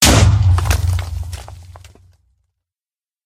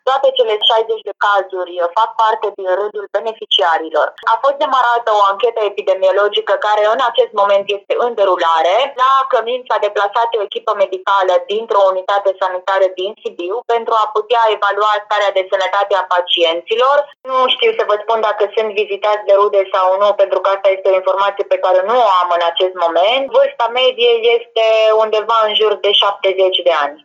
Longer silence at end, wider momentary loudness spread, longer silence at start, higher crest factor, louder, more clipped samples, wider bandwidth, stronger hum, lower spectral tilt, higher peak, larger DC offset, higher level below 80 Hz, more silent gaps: first, 1.5 s vs 0.1 s; first, 20 LU vs 6 LU; about the same, 0 s vs 0.05 s; about the same, 16 dB vs 14 dB; about the same, -15 LUFS vs -14 LUFS; neither; first, 16 kHz vs 7.8 kHz; neither; first, -4 dB/octave vs -2 dB/octave; about the same, 0 dBFS vs 0 dBFS; neither; first, -24 dBFS vs -84 dBFS; neither